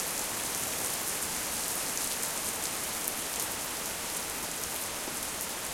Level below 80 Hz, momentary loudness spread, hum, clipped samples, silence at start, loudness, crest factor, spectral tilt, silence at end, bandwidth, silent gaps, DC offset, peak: -58 dBFS; 3 LU; none; under 0.1%; 0 s; -31 LUFS; 28 dB; -0.5 dB/octave; 0 s; 17 kHz; none; under 0.1%; -6 dBFS